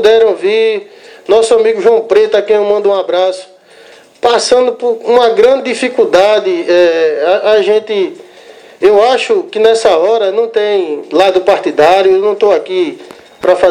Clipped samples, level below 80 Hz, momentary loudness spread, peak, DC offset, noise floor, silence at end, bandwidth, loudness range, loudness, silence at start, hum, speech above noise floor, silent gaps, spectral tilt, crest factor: 0.6%; -52 dBFS; 8 LU; 0 dBFS; under 0.1%; -39 dBFS; 0 s; 10.5 kHz; 2 LU; -10 LUFS; 0 s; none; 29 dB; none; -3.5 dB/octave; 10 dB